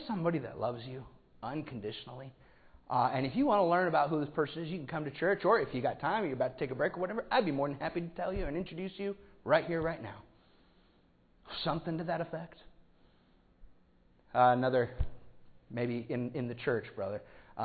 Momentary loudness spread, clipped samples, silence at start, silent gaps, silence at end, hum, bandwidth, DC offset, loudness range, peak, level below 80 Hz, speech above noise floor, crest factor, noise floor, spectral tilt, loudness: 16 LU; under 0.1%; 0 s; none; 0 s; none; 4.8 kHz; under 0.1%; 9 LU; -14 dBFS; -54 dBFS; 34 dB; 22 dB; -66 dBFS; -5 dB/octave; -34 LUFS